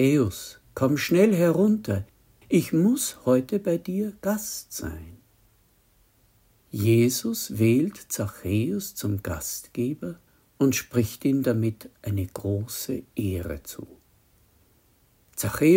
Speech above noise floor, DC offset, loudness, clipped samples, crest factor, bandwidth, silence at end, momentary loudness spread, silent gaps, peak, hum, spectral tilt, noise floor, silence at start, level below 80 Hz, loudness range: 38 dB; under 0.1%; -25 LUFS; under 0.1%; 18 dB; 16.5 kHz; 0 s; 15 LU; none; -8 dBFS; none; -6 dB/octave; -62 dBFS; 0 s; -56 dBFS; 9 LU